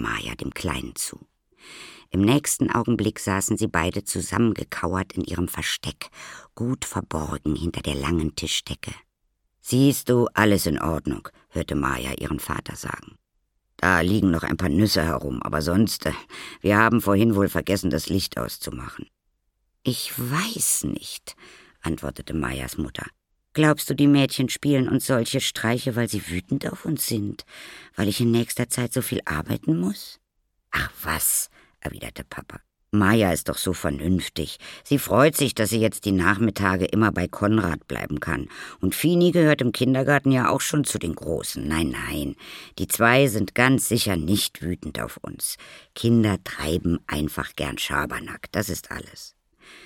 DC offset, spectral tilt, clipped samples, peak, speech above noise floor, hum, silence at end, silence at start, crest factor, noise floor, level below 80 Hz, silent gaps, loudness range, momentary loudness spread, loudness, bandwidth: under 0.1%; -4.5 dB/octave; under 0.1%; -2 dBFS; 49 dB; none; 0 s; 0 s; 22 dB; -73 dBFS; -44 dBFS; none; 6 LU; 15 LU; -23 LUFS; 17.5 kHz